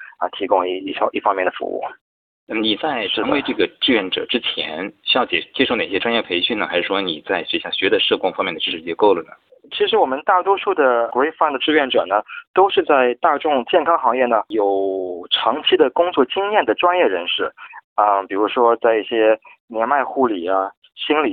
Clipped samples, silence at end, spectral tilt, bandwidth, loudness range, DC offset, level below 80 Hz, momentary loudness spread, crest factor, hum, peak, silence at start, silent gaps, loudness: under 0.1%; 0 s; -7 dB/octave; 4.7 kHz; 3 LU; under 0.1%; -62 dBFS; 7 LU; 18 dB; none; -2 dBFS; 0 s; 2.01-2.47 s, 12.47-12.54 s, 17.84-17.96 s, 19.60-19.68 s, 20.77-20.82 s; -18 LUFS